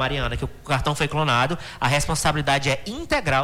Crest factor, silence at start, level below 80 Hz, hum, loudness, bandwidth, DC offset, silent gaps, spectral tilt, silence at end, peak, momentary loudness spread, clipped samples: 14 dB; 0 s; -36 dBFS; none; -22 LUFS; 18 kHz; under 0.1%; none; -4 dB/octave; 0 s; -8 dBFS; 5 LU; under 0.1%